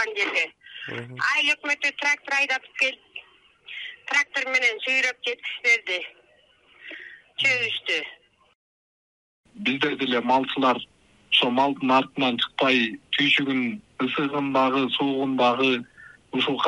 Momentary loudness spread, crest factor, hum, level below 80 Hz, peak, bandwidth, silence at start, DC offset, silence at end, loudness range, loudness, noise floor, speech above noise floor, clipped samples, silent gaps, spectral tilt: 15 LU; 20 dB; none; -70 dBFS; -6 dBFS; 11.5 kHz; 0 s; under 0.1%; 0 s; 5 LU; -23 LUFS; -59 dBFS; 36 dB; under 0.1%; 8.55-9.44 s; -3.5 dB/octave